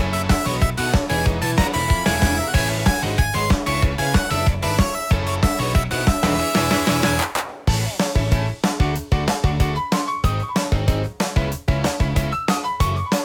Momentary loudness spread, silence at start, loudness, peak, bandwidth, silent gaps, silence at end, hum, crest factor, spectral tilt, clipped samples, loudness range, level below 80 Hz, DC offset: 4 LU; 0 s; -20 LUFS; -4 dBFS; 18 kHz; none; 0 s; none; 14 dB; -5 dB/octave; under 0.1%; 2 LU; -26 dBFS; under 0.1%